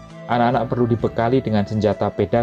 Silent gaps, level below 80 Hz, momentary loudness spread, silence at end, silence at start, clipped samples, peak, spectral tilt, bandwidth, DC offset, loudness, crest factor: none; -44 dBFS; 3 LU; 0 s; 0 s; under 0.1%; -6 dBFS; -8.5 dB/octave; 7.8 kHz; under 0.1%; -20 LUFS; 14 dB